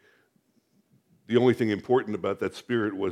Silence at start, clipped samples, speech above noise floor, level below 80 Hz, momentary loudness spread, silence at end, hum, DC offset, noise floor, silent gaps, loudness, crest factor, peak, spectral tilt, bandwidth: 1.3 s; under 0.1%; 43 dB; -72 dBFS; 8 LU; 0 s; none; under 0.1%; -68 dBFS; none; -26 LUFS; 20 dB; -8 dBFS; -7 dB/octave; 12 kHz